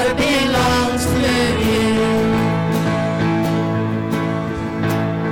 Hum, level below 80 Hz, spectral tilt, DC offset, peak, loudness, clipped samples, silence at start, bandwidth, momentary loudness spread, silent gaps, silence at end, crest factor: none; -36 dBFS; -5.5 dB/octave; under 0.1%; -8 dBFS; -17 LUFS; under 0.1%; 0 s; 17 kHz; 5 LU; none; 0 s; 8 dB